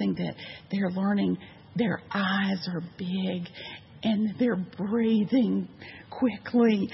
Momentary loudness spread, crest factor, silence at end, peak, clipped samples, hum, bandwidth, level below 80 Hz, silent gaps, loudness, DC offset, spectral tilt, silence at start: 14 LU; 16 dB; 0 s; -12 dBFS; under 0.1%; none; 6 kHz; -68 dBFS; none; -28 LUFS; under 0.1%; -9 dB/octave; 0 s